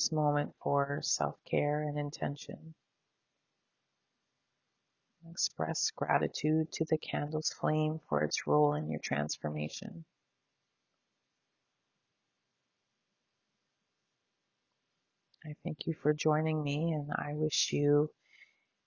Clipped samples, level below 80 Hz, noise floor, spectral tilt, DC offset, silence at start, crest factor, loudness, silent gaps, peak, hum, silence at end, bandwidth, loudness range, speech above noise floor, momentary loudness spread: under 0.1%; -72 dBFS; -84 dBFS; -4.5 dB/octave; under 0.1%; 0 s; 22 dB; -33 LUFS; none; -12 dBFS; none; 0.4 s; 7.4 kHz; 13 LU; 51 dB; 11 LU